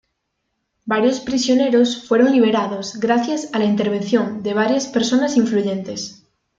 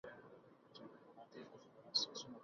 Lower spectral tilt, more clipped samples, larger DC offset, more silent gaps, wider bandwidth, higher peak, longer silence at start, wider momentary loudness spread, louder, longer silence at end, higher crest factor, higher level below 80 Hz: first, -4.5 dB/octave vs -1 dB/octave; neither; neither; neither; about the same, 7.8 kHz vs 7.2 kHz; first, -2 dBFS vs -24 dBFS; first, 0.85 s vs 0.05 s; second, 9 LU vs 23 LU; first, -18 LUFS vs -41 LUFS; first, 0.45 s vs 0 s; second, 16 dB vs 26 dB; first, -60 dBFS vs -88 dBFS